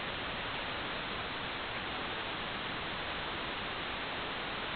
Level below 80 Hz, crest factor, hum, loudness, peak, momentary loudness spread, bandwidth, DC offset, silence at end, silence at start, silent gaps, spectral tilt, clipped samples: -56 dBFS; 12 dB; none; -37 LUFS; -26 dBFS; 0 LU; 4.9 kHz; under 0.1%; 0 s; 0 s; none; -1 dB/octave; under 0.1%